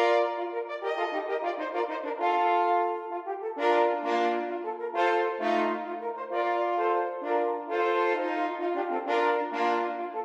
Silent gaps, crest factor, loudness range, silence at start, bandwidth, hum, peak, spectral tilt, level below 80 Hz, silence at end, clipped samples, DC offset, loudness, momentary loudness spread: none; 16 dB; 1 LU; 0 s; 8.2 kHz; none; -12 dBFS; -4 dB/octave; -84 dBFS; 0 s; under 0.1%; under 0.1%; -28 LUFS; 8 LU